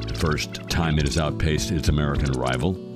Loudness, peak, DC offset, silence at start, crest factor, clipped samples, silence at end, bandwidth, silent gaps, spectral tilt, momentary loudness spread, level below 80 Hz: -24 LUFS; -8 dBFS; under 0.1%; 0 s; 14 dB; under 0.1%; 0 s; 15.5 kHz; none; -5.5 dB/octave; 3 LU; -30 dBFS